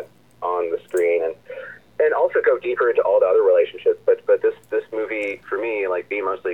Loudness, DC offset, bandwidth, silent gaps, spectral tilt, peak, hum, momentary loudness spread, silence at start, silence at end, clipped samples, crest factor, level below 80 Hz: -20 LUFS; 0.1%; 17 kHz; none; -5 dB/octave; -6 dBFS; none; 10 LU; 0 s; 0 s; under 0.1%; 14 dB; -68 dBFS